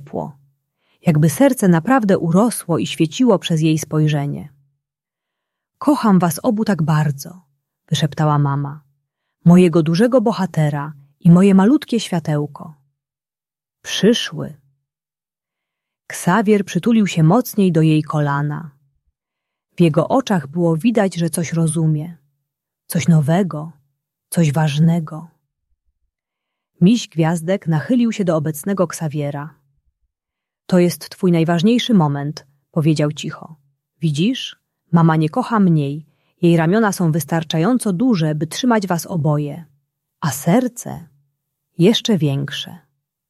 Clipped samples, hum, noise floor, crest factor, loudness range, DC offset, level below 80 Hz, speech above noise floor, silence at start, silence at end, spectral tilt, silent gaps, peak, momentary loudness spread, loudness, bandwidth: under 0.1%; none; under -90 dBFS; 16 dB; 5 LU; under 0.1%; -58 dBFS; over 74 dB; 0 s; 0.5 s; -6.5 dB/octave; none; -2 dBFS; 14 LU; -17 LUFS; 14 kHz